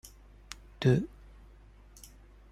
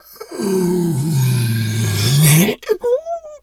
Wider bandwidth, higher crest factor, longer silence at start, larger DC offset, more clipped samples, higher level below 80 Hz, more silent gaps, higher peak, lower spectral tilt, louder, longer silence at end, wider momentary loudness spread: second, 14.5 kHz vs 19 kHz; first, 22 dB vs 16 dB; about the same, 0.05 s vs 0.1 s; neither; neither; about the same, -54 dBFS vs -50 dBFS; neither; second, -12 dBFS vs 0 dBFS; first, -7 dB/octave vs -5 dB/octave; second, -30 LUFS vs -16 LUFS; first, 1.45 s vs 0.05 s; first, 26 LU vs 9 LU